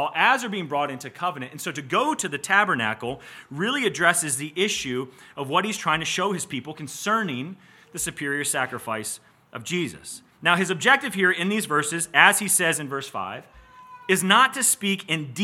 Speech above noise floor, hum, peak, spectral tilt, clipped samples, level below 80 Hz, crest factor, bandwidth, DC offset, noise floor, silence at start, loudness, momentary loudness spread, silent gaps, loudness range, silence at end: 22 dB; none; 0 dBFS; -2.5 dB/octave; under 0.1%; -64 dBFS; 24 dB; 17 kHz; under 0.1%; -46 dBFS; 0 s; -23 LUFS; 15 LU; none; 7 LU; 0 s